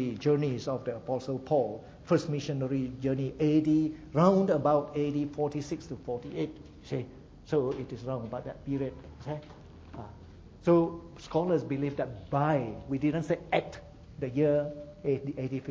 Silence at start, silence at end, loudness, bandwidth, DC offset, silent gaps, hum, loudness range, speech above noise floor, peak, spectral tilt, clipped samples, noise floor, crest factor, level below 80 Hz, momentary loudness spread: 0 s; 0 s; -31 LUFS; 7.8 kHz; under 0.1%; none; none; 8 LU; 20 dB; -10 dBFS; -8 dB/octave; under 0.1%; -50 dBFS; 20 dB; -56 dBFS; 16 LU